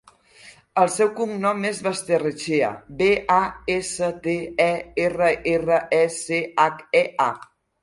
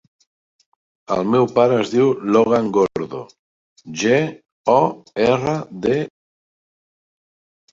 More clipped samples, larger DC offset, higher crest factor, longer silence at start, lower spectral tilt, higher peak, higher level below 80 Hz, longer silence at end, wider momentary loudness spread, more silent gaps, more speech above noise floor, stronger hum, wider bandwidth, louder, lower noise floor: neither; neither; about the same, 18 dB vs 18 dB; second, 0.45 s vs 1.1 s; second, -4.5 dB/octave vs -6 dB/octave; about the same, -4 dBFS vs -2 dBFS; about the same, -54 dBFS vs -58 dBFS; second, 0.4 s vs 1.65 s; second, 6 LU vs 12 LU; second, none vs 3.39-3.76 s, 4.52-4.64 s; second, 28 dB vs over 73 dB; neither; first, 11.5 kHz vs 7.8 kHz; second, -22 LUFS vs -18 LUFS; second, -49 dBFS vs under -90 dBFS